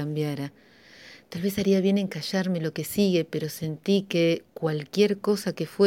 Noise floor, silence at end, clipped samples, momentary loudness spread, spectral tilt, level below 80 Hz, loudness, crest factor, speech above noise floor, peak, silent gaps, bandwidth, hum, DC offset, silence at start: -50 dBFS; 0 s; under 0.1%; 8 LU; -6 dB/octave; -62 dBFS; -26 LUFS; 18 dB; 24 dB; -8 dBFS; none; 17 kHz; none; under 0.1%; 0 s